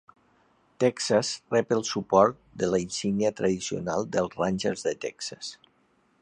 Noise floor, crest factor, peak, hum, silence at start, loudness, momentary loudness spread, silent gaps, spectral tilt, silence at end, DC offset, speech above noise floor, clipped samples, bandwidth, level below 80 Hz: -67 dBFS; 22 dB; -6 dBFS; none; 0.8 s; -27 LUFS; 11 LU; none; -4.5 dB/octave; 0.65 s; under 0.1%; 40 dB; under 0.1%; 11 kHz; -60 dBFS